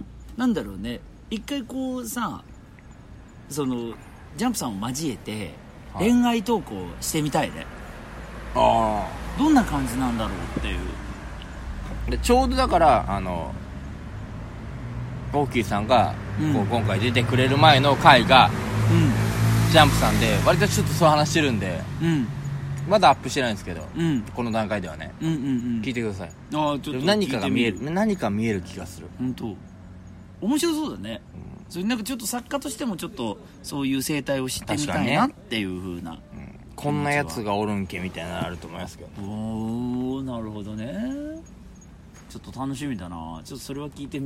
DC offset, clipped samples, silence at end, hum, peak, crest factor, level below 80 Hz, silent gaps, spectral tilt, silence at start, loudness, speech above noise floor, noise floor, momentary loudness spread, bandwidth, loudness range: under 0.1%; under 0.1%; 0 s; none; 0 dBFS; 24 dB; -40 dBFS; none; -5 dB/octave; 0 s; -23 LUFS; 22 dB; -45 dBFS; 18 LU; 16 kHz; 13 LU